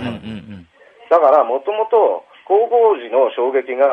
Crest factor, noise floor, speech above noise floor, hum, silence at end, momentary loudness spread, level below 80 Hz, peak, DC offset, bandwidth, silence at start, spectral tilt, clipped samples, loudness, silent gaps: 14 dB; -45 dBFS; 31 dB; none; 0 s; 14 LU; -60 dBFS; -2 dBFS; under 0.1%; 5.6 kHz; 0 s; -7.5 dB/octave; under 0.1%; -15 LUFS; none